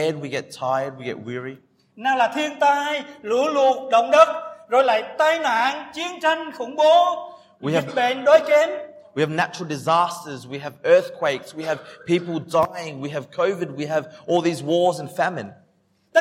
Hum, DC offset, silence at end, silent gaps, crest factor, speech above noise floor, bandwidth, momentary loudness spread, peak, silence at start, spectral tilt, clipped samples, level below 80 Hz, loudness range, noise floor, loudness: none; under 0.1%; 0 s; none; 20 dB; 42 dB; 15.5 kHz; 15 LU; -2 dBFS; 0 s; -4.5 dB/octave; under 0.1%; -70 dBFS; 5 LU; -63 dBFS; -21 LUFS